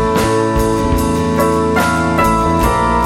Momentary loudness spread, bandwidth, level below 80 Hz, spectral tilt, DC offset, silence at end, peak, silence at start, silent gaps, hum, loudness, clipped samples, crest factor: 2 LU; 16.5 kHz; -24 dBFS; -6 dB/octave; under 0.1%; 0 s; 0 dBFS; 0 s; none; none; -14 LUFS; under 0.1%; 12 dB